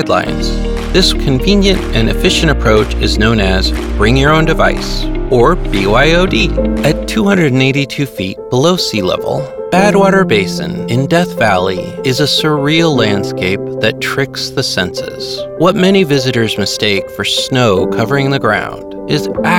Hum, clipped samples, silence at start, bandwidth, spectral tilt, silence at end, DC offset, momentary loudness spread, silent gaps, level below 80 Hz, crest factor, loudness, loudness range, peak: none; under 0.1%; 0 s; 17.5 kHz; -5 dB/octave; 0 s; 0.3%; 8 LU; none; -22 dBFS; 12 dB; -12 LUFS; 2 LU; 0 dBFS